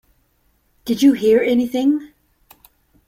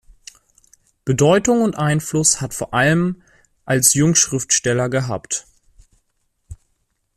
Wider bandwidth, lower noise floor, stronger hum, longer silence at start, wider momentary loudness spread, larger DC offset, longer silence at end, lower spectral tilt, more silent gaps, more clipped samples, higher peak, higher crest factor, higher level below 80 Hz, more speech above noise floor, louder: about the same, 16 kHz vs 15.5 kHz; second, -62 dBFS vs -68 dBFS; neither; second, 0.85 s vs 1.05 s; about the same, 11 LU vs 10 LU; neither; first, 1 s vs 0.6 s; about the same, -5 dB/octave vs -4 dB/octave; neither; neither; second, -4 dBFS vs 0 dBFS; about the same, 16 dB vs 20 dB; second, -58 dBFS vs -48 dBFS; second, 47 dB vs 51 dB; about the same, -17 LUFS vs -17 LUFS